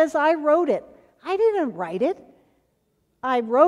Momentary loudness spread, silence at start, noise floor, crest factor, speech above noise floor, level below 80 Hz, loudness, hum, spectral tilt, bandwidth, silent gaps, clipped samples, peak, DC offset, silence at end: 11 LU; 0 s; -69 dBFS; 20 dB; 48 dB; -68 dBFS; -23 LUFS; none; -6 dB/octave; 11 kHz; none; under 0.1%; -2 dBFS; under 0.1%; 0 s